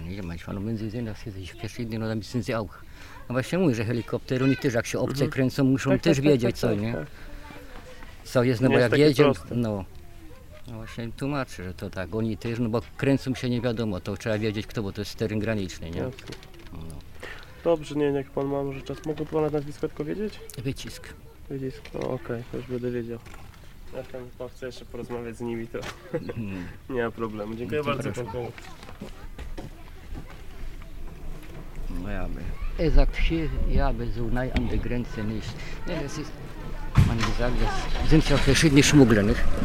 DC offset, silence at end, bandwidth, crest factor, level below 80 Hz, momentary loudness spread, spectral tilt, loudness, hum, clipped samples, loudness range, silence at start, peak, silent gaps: 0.1%; 0 s; 15.5 kHz; 22 dB; -32 dBFS; 21 LU; -6 dB/octave; -27 LUFS; none; under 0.1%; 11 LU; 0 s; -4 dBFS; none